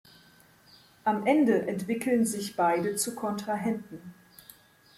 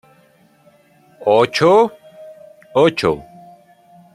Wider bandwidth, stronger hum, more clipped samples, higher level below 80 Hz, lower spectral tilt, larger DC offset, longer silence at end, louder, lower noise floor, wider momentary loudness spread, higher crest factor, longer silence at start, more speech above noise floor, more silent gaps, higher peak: first, 16 kHz vs 14 kHz; neither; neither; second, -72 dBFS vs -54 dBFS; about the same, -4.5 dB/octave vs -5.5 dB/octave; neither; about the same, 0.85 s vs 0.95 s; second, -28 LUFS vs -15 LUFS; first, -58 dBFS vs -53 dBFS; about the same, 12 LU vs 10 LU; about the same, 20 dB vs 18 dB; second, 1.05 s vs 1.2 s; second, 31 dB vs 39 dB; neither; second, -10 dBFS vs -2 dBFS